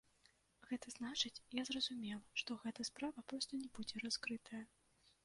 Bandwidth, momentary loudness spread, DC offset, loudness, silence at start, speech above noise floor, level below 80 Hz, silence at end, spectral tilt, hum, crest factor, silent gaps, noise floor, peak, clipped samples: 11.5 kHz; 8 LU; under 0.1%; -45 LUFS; 0.6 s; 29 dB; -78 dBFS; 0.6 s; -2 dB/octave; none; 22 dB; none; -75 dBFS; -24 dBFS; under 0.1%